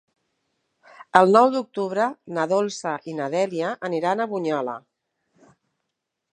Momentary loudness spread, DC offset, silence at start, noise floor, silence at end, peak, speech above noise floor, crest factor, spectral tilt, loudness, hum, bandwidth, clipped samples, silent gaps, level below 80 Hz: 13 LU; under 0.1%; 1 s; -81 dBFS; 1.55 s; 0 dBFS; 59 dB; 24 dB; -5.5 dB/octave; -22 LUFS; none; 10.5 kHz; under 0.1%; none; -70 dBFS